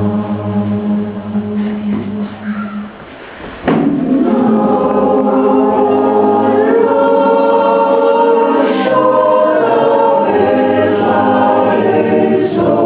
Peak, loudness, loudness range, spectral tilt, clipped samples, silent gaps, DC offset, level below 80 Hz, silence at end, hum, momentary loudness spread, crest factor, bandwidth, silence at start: 0 dBFS; -12 LUFS; 8 LU; -11 dB/octave; under 0.1%; none; 0.1%; -46 dBFS; 0 s; none; 10 LU; 12 dB; 4 kHz; 0 s